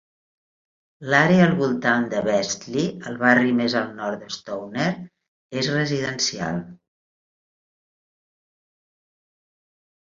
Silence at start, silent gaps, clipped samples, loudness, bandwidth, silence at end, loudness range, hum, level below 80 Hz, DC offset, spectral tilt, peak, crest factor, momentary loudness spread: 1 s; 5.28-5.50 s; under 0.1%; -22 LUFS; 7.6 kHz; 3.35 s; 10 LU; none; -62 dBFS; under 0.1%; -5 dB/octave; -2 dBFS; 22 dB; 14 LU